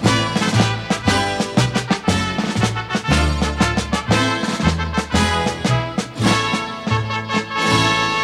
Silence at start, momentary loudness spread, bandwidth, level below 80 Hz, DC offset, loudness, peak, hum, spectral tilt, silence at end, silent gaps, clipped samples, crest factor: 0 s; 5 LU; 14 kHz; -32 dBFS; under 0.1%; -18 LUFS; -2 dBFS; none; -4.5 dB/octave; 0 s; none; under 0.1%; 18 dB